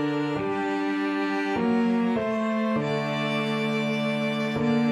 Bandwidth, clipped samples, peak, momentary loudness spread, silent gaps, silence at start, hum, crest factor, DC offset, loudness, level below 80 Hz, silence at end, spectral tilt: 11 kHz; under 0.1%; -14 dBFS; 3 LU; none; 0 s; none; 12 dB; under 0.1%; -26 LUFS; -62 dBFS; 0 s; -6.5 dB/octave